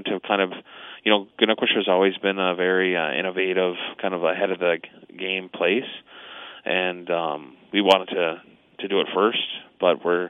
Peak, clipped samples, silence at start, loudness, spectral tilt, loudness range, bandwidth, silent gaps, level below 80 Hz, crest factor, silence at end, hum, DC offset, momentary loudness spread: -2 dBFS; under 0.1%; 0 s; -23 LUFS; -5.5 dB/octave; 4 LU; 8.8 kHz; none; -76 dBFS; 22 dB; 0 s; none; under 0.1%; 15 LU